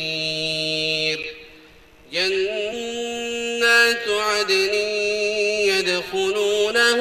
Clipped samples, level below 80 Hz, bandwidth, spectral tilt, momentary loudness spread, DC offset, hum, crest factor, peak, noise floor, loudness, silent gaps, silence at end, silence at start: under 0.1%; -56 dBFS; 14.5 kHz; -2 dB/octave; 10 LU; under 0.1%; none; 18 dB; -4 dBFS; -49 dBFS; -20 LUFS; none; 0 s; 0 s